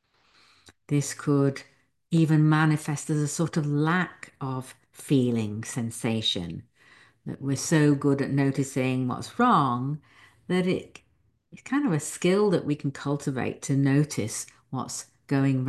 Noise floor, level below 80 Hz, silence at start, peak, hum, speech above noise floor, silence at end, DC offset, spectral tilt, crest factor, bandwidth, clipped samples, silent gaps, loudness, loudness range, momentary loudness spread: -62 dBFS; -62 dBFS; 0.65 s; -8 dBFS; none; 37 dB; 0 s; under 0.1%; -6 dB/octave; 18 dB; 12.5 kHz; under 0.1%; none; -26 LUFS; 3 LU; 13 LU